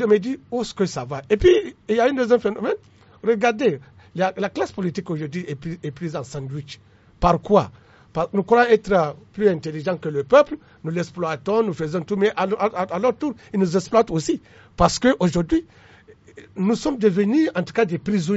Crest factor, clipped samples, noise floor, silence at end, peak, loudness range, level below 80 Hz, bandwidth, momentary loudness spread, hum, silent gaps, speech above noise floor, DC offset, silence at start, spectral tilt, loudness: 20 dB; under 0.1%; -49 dBFS; 0 s; -2 dBFS; 4 LU; -44 dBFS; 8 kHz; 13 LU; none; none; 28 dB; under 0.1%; 0 s; -5.5 dB/octave; -21 LUFS